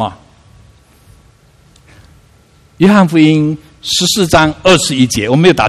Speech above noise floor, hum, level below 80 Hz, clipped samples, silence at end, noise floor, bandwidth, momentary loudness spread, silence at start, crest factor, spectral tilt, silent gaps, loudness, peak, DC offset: 37 dB; none; -38 dBFS; 0.3%; 0 s; -46 dBFS; 14 kHz; 8 LU; 0 s; 12 dB; -4.5 dB/octave; none; -10 LUFS; 0 dBFS; under 0.1%